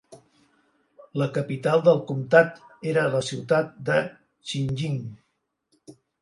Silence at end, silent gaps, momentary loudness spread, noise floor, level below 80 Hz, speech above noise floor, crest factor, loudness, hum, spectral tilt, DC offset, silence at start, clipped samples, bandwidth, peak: 0.3 s; none; 15 LU; -75 dBFS; -64 dBFS; 52 dB; 22 dB; -24 LUFS; none; -6 dB/octave; under 0.1%; 0.1 s; under 0.1%; 11.5 kHz; -2 dBFS